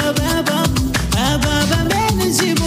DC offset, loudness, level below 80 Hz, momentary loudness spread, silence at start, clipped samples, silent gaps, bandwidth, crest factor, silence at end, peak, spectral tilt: under 0.1%; -16 LUFS; -28 dBFS; 1 LU; 0 s; under 0.1%; none; 16 kHz; 12 dB; 0 s; -4 dBFS; -4 dB/octave